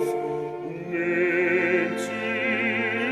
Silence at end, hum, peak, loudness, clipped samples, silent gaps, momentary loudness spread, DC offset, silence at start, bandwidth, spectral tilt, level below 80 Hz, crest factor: 0 s; none; -10 dBFS; -25 LUFS; under 0.1%; none; 9 LU; under 0.1%; 0 s; 14 kHz; -5.5 dB/octave; -70 dBFS; 16 dB